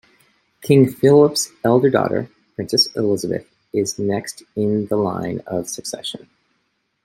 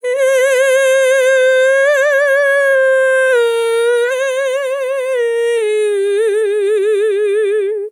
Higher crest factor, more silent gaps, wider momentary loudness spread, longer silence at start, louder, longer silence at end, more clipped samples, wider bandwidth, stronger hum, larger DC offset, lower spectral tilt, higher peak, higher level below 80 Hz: first, 18 dB vs 8 dB; neither; first, 15 LU vs 5 LU; first, 0.6 s vs 0.05 s; second, -19 LUFS vs -13 LUFS; first, 0.9 s vs 0 s; neither; about the same, 16.5 kHz vs 15.5 kHz; neither; neither; first, -5 dB/octave vs 1.5 dB/octave; about the same, -2 dBFS vs -4 dBFS; first, -60 dBFS vs under -90 dBFS